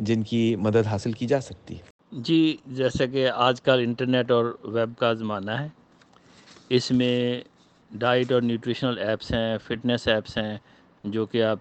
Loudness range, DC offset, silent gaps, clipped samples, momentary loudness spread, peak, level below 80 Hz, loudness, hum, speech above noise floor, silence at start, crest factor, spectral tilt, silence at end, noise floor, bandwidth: 3 LU; under 0.1%; 1.90-1.99 s; under 0.1%; 12 LU; -6 dBFS; -54 dBFS; -25 LUFS; none; 32 dB; 0 s; 20 dB; -6.5 dB/octave; 0 s; -56 dBFS; 8.6 kHz